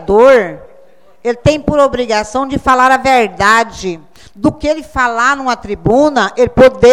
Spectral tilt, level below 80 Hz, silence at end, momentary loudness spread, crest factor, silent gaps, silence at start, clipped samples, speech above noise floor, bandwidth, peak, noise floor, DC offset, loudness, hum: -5 dB/octave; -34 dBFS; 0 s; 11 LU; 12 dB; none; 0 s; 0.7%; 35 dB; 13.5 kHz; 0 dBFS; -45 dBFS; 0.9%; -11 LUFS; none